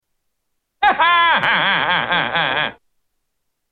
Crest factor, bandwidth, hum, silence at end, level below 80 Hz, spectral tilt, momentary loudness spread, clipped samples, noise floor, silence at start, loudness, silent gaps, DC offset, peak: 16 dB; 6.2 kHz; none; 1 s; -54 dBFS; -5 dB/octave; 6 LU; under 0.1%; -73 dBFS; 0.8 s; -16 LUFS; none; under 0.1%; -2 dBFS